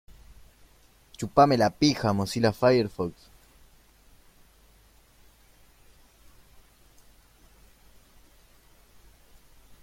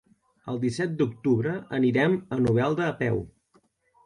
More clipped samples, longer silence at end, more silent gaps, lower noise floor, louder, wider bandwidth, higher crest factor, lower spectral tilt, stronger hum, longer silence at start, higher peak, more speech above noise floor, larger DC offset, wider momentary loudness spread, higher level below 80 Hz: neither; first, 6.75 s vs 0.75 s; neither; second, -58 dBFS vs -65 dBFS; about the same, -24 LUFS vs -26 LUFS; first, 16.5 kHz vs 10.5 kHz; first, 24 dB vs 16 dB; second, -5.5 dB/octave vs -7.5 dB/octave; neither; second, 0.1 s vs 0.45 s; first, -6 dBFS vs -10 dBFS; second, 35 dB vs 40 dB; neither; first, 13 LU vs 9 LU; about the same, -56 dBFS vs -58 dBFS